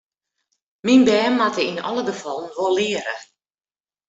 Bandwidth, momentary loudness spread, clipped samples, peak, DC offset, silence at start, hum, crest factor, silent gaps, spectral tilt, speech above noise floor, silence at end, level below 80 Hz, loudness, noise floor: 8 kHz; 14 LU; under 0.1%; -4 dBFS; under 0.1%; 0.85 s; none; 18 dB; none; -4 dB/octave; over 71 dB; 0.85 s; -64 dBFS; -20 LUFS; under -90 dBFS